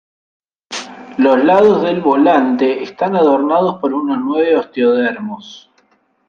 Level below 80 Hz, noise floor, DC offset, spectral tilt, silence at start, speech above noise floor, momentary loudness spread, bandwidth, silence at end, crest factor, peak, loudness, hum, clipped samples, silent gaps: -60 dBFS; -57 dBFS; under 0.1%; -6 dB/octave; 0.7 s; 44 dB; 16 LU; 9 kHz; 0.7 s; 14 dB; 0 dBFS; -13 LUFS; none; under 0.1%; none